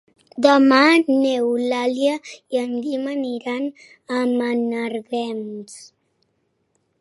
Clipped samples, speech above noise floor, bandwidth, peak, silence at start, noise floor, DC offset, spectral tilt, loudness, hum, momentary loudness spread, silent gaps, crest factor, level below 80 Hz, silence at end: under 0.1%; 50 dB; 11.5 kHz; 0 dBFS; 0.35 s; -69 dBFS; under 0.1%; -4 dB/octave; -20 LUFS; none; 17 LU; none; 20 dB; -76 dBFS; 1.15 s